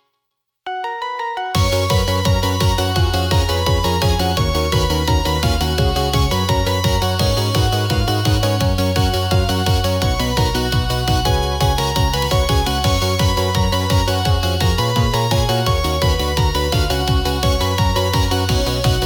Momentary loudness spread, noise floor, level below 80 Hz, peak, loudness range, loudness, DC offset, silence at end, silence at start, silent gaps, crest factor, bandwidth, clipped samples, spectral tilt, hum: 1 LU; -75 dBFS; -24 dBFS; -6 dBFS; 1 LU; -17 LUFS; under 0.1%; 0 s; 0.65 s; none; 12 dB; 19 kHz; under 0.1%; -5 dB/octave; none